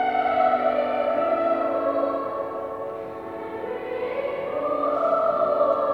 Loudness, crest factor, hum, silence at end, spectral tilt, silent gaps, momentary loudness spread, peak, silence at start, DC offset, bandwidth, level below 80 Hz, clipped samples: -24 LUFS; 14 dB; none; 0 s; -7 dB/octave; none; 11 LU; -8 dBFS; 0 s; under 0.1%; 5.6 kHz; -62 dBFS; under 0.1%